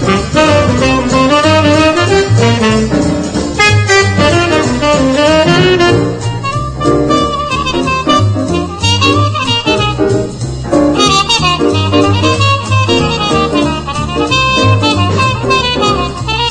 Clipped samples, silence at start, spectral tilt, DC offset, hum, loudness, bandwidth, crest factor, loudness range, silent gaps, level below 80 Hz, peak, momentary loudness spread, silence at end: 0.1%; 0 s; -5 dB/octave; under 0.1%; none; -10 LUFS; 10.5 kHz; 10 dB; 2 LU; none; -28 dBFS; 0 dBFS; 7 LU; 0 s